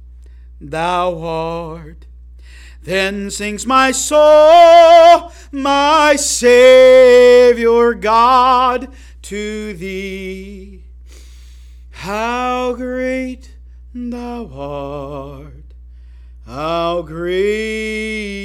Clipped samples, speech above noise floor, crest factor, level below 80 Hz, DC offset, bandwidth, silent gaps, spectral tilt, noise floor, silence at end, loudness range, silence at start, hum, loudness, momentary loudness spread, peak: under 0.1%; 25 dB; 14 dB; -38 dBFS; under 0.1%; 14.5 kHz; none; -3.5 dB/octave; -37 dBFS; 0 s; 18 LU; 0.6 s; 60 Hz at -35 dBFS; -11 LUFS; 22 LU; 0 dBFS